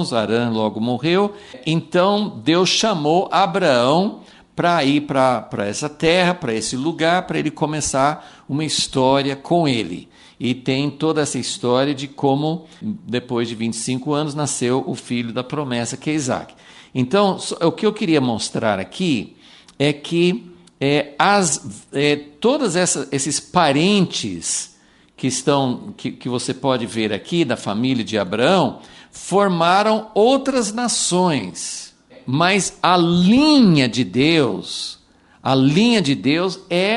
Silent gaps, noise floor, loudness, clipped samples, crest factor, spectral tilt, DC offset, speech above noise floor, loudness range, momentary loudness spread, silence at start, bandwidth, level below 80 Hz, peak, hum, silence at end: none; -49 dBFS; -19 LUFS; under 0.1%; 18 dB; -4.5 dB/octave; under 0.1%; 30 dB; 6 LU; 10 LU; 0 s; 11.5 kHz; -54 dBFS; 0 dBFS; none; 0 s